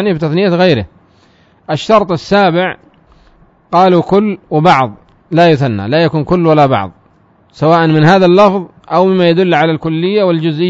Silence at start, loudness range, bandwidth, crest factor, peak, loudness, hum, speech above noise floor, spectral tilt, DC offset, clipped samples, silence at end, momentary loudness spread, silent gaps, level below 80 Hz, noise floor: 0 s; 3 LU; 7.8 kHz; 10 dB; 0 dBFS; -11 LUFS; none; 39 dB; -7.5 dB/octave; under 0.1%; 0.3%; 0 s; 9 LU; none; -44 dBFS; -49 dBFS